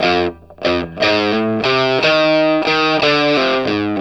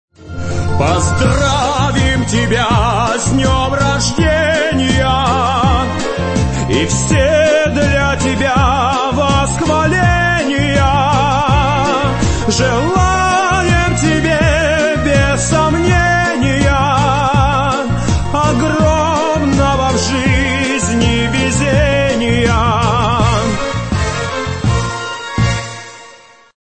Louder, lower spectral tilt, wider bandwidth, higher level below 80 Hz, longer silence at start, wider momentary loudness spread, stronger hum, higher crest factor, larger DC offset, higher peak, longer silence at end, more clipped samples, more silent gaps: about the same, -15 LUFS vs -13 LUFS; about the same, -5 dB/octave vs -5 dB/octave; about the same, 8.4 kHz vs 8.8 kHz; second, -48 dBFS vs -24 dBFS; second, 0 s vs 0.2 s; about the same, 6 LU vs 5 LU; neither; about the same, 16 dB vs 12 dB; first, 0.2% vs under 0.1%; about the same, 0 dBFS vs 0 dBFS; second, 0 s vs 0.5 s; neither; neither